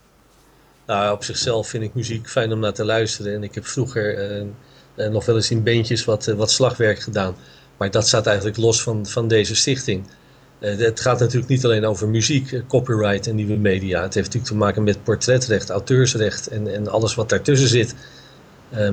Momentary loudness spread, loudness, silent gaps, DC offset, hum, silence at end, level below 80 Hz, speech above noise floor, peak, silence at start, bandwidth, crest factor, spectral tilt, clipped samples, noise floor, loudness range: 10 LU; -20 LUFS; none; under 0.1%; none; 0 s; -50 dBFS; 34 dB; -4 dBFS; 0.9 s; 9.6 kHz; 16 dB; -4.5 dB/octave; under 0.1%; -53 dBFS; 4 LU